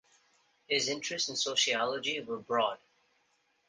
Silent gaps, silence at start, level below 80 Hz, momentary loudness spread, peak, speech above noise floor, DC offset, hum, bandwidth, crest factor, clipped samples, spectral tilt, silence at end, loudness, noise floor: none; 0.7 s; -78 dBFS; 6 LU; -16 dBFS; 41 dB; under 0.1%; none; 10 kHz; 18 dB; under 0.1%; -1 dB/octave; 0.95 s; -31 LUFS; -74 dBFS